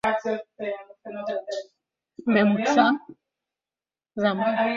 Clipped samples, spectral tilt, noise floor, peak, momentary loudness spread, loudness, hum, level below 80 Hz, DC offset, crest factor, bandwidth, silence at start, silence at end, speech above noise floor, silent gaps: under 0.1%; -5.5 dB/octave; under -90 dBFS; -6 dBFS; 15 LU; -25 LUFS; none; -68 dBFS; under 0.1%; 20 dB; 7.6 kHz; 0.05 s; 0 s; over 68 dB; none